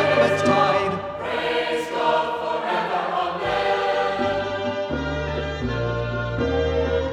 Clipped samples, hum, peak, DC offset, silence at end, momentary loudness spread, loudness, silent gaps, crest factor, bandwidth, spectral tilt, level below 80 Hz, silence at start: under 0.1%; none; -6 dBFS; under 0.1%; 0 s; 8 LU; -23 LUFS; none; 16 dB; 12.5 kHz; -5.5 dB/octave; -38 dBFS; 0 s